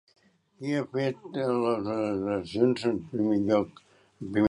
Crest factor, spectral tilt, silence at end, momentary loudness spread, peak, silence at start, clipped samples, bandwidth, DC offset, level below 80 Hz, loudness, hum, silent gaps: 18 dB; -7.5 dB/octave; 0 s; 7 LU; -10 dBFS; 0.6 s; under 0.1%; 11 kHz; under 0.1%; -62 dBFS; -28 LUFS; none; none